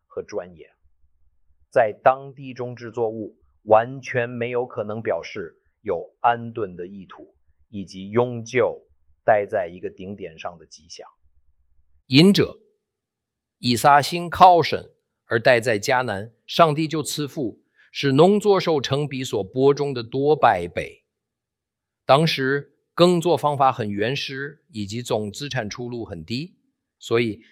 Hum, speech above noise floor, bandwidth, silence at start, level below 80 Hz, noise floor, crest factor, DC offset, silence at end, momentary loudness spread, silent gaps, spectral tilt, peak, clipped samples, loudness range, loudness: none; 63 dB; 16.5 kHz; 0.15 s; -60 dBFS; -85 dBFS; 22 dB; under 0.1%; 0.15 s; 19 LU; none; -5.5 dB/octave; -2 dBFS; under 0.1%; 9 LU; -21 LUFS